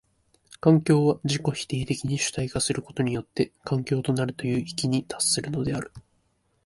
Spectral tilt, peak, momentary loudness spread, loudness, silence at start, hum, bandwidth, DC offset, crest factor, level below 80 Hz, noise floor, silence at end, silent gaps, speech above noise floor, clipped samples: -5 dB/octave; -6 dBFS; 8 LU; -26 LUFS; 0.65 s; none; 11.5 kHz; under 0.1%; 20 dB; -54 dBFS; -69 dBFS; 0.65 s; none; 44 dB; under 0.1%